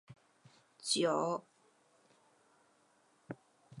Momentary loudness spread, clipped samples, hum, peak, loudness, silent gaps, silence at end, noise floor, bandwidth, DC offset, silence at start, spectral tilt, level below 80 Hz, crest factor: 20 LU; under 0.1%; none; -20 dBFS; -35 LUFS; none; 0 s; -71 dBFS; 11 kHz; under 0.1%; 0.1 s; -3 dB/octave; -86 dBFS; 22 dB